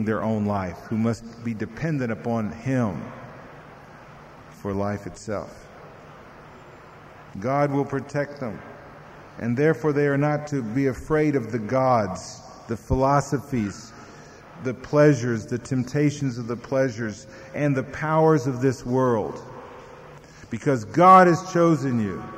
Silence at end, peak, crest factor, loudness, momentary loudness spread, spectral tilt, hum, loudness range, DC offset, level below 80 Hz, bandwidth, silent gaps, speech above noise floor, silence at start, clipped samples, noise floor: 0 s; -4 dBFS; 20 dB; -23 LUFS; 22 LU; -7 dB/octave; none; 11 LU; under 0.1%; -50 dBFS; 15 kHz; none; 23 dB; 0 s; under 0.1%; -45 dBFS